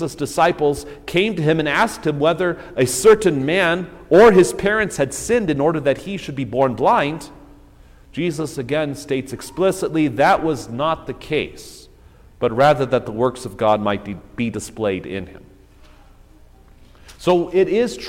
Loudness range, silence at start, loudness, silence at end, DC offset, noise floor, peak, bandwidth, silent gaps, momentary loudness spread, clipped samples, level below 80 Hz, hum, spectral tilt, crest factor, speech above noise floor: 8 LU; 0 s; -18 LUFS; 0 s; under 0.1%; -47 dBFS; -2 dBFS; 16.5 kHz; none; 11 LU; under 0.1%; -46 dBFS; 60 Hz at -50 dBFS; -5 dB/octave; 16 dB; 28 dB